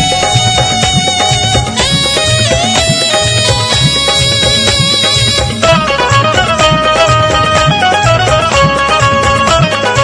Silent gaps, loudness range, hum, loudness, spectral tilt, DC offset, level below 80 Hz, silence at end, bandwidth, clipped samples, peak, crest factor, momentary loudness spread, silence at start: none; 1 LU; none; -8 LUFS; -3 dB/octave; under 0.1%; -26 dBFS; 0 s; 11 kHz; 0.4%; 0 dBFS; 10 dB; 2 LU; 0 s